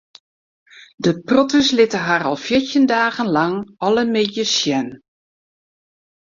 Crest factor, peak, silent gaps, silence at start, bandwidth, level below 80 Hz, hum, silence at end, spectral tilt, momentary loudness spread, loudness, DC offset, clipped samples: 18 dB; -2 dBFS; 0.94-0.98 s; 0.8 s; 7.6 kHz; -56 dBFS; none; 1.3 s; -4 dB/octave; 7 LU; -17 LUFS; under 0.1%; under 0.1%